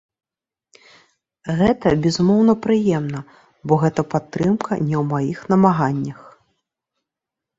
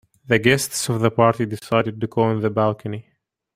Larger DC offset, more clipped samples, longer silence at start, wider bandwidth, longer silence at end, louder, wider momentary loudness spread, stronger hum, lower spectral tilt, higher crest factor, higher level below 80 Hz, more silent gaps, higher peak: neither; neither; first, 1.45 s vs 0.3 s; second, 7.8 kHz vs 16 kHz; first, 1.3 s vs 0.55 s; about the same, -19 LUFS vs -20 LUFS; about the same, 11 LU vs 9 LU; neither; first, -7.5 dB/octave vs -5 dB/octave; about the same, 18 dB vs 18 dB; first, -50 dBFS vs -56 dBFS; neither; about the same, -2 dBFS vs -2 dBFS